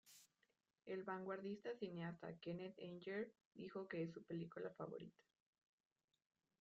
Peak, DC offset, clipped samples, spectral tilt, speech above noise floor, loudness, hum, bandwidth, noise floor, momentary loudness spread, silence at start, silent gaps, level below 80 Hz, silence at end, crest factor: -36 dBFS; under 0.1%; under 0.1%; -5.5 dB/octave; 36 dB; -52 LUFS; none; 7.4 kHz; -87 dBFS; 9 LU; 0.05 s; 3.45-3.51 s; -88 dBFS; 1.5 s; 18 dB